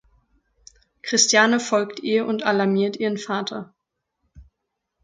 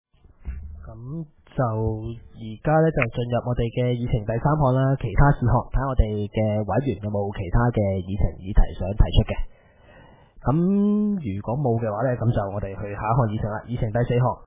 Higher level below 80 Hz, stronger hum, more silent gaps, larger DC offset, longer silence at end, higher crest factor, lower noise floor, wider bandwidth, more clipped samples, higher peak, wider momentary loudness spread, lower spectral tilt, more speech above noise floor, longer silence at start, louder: second, -60 dBFS vs -30 dBFS; neither; neither; neither; first, 0.6 s vs 0 s; about the same, 22 dB vs 20 dB; first, -80 dBFS vs -51 dBFS; first, 11 kHz vs 3.8 kHz; neither; about the same, -2 dBFS vs -4 dBFS; second, 12 LU vs 15 LU; second, -3 dB/octave vs -12 dB/octave; first, 59 dB vs 29 dB; first, 1.05 s vs 0.4 s; first, -20 LUFS vs -24 LUFS